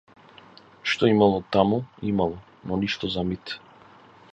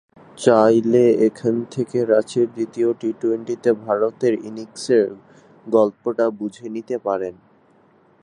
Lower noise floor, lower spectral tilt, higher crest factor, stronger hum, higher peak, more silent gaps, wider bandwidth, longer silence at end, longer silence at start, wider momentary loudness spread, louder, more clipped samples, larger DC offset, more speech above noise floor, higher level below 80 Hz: second, -51 dBFS vs -55 dBFS; about the same, -6.5 dB/octave vs -6.5 dB/octave; about the same, 22 dB vs 18 dB; neither; about the same, -4 dBFS vs -2 dBFS; neither; second, 8.2 kHz vs 11 kHz; second, 0.75 s vs 0.9 s; first, 0.85 s vs 0.35 s; about the same, 14 LU vs 12 LU; second, -24 LUFS vs -20 LUFS; neither; neither; second, 28 dB vs 36 dB; first, -52 dBFS vs -68 dBFS